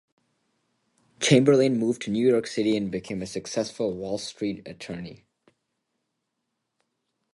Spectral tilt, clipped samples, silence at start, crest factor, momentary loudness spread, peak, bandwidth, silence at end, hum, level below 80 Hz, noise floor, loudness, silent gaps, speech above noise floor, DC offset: -5 dB/octave; under 0.1%; 1.2 s; 22 dB; 17 LU; -4 dBFS; 11.5 kHz; 2.2 s; none; -62 dBFS; -80 dBFS; -25 LUFS; none; 56 dB; under 0.1%